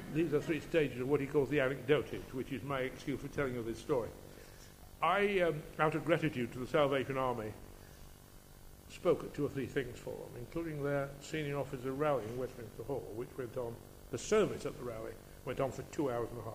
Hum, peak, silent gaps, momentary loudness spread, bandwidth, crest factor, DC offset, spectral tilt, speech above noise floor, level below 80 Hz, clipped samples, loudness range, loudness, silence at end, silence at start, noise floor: none; -14 dBFS; none; 15 LU; 15.5 kHz; 22 dB; under 0.1%; -6 dB/octave; 20 dB; -56 dBFS; under 0.1%; 5 LU; -36 LUFS; 0 s; 0 s; -56 dBFS